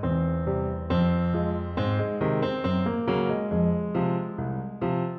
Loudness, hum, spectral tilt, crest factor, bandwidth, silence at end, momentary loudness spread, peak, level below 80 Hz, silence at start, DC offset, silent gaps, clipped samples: -27 LUFS; none; -10 dB/octave; 14 dB; 4.9 kHz; 0 s; 5 LU; -12 dBFS; -44 dBFS; 0 s; under 0.1%; none; under 0.1%